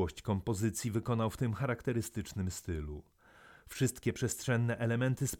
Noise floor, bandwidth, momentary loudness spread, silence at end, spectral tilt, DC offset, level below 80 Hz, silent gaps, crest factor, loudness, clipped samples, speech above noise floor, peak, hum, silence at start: -60 dBFS; 17.5 kHz; 8 LU; 0 s; -5.5 dB/octave; under 0.1%; -54 dBFS; none; 16 dB; -35 LUFS; under 0.1%; 26 dB; -18 dBFS; none; 0 s